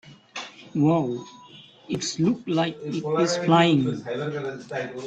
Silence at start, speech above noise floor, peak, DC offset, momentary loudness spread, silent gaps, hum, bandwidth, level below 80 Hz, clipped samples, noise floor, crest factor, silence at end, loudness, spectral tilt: 0.05 s; 25 dB; -6 dBFS; under 0.1%; 17 LU; none; none; 8.8 kHz; -64 dBFS; under 0.1%; -48 dBFS; 18 dB; 0 s; -24 LUFS; -5.5 dB/octave